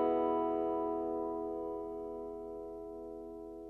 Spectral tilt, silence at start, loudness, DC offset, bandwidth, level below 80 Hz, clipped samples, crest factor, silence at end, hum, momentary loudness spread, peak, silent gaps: -8.5 dB/octave; 0 s; -38 LUFS; under 0.1%; 3.9 kHz; -64 dBFS; under 0.1%; 16 dB; 0 s; none; 13 LU; -20 dBFS; none